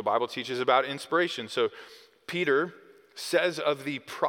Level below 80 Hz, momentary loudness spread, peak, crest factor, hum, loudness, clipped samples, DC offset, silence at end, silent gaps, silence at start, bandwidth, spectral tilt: -82 dBFS; 12 LU; -8 dBFS; 20 dB; none; -28 LUFS; under 0.1%; under 0.1%; 0 s; none; 0 s; 18 kHz; -4 dB/octave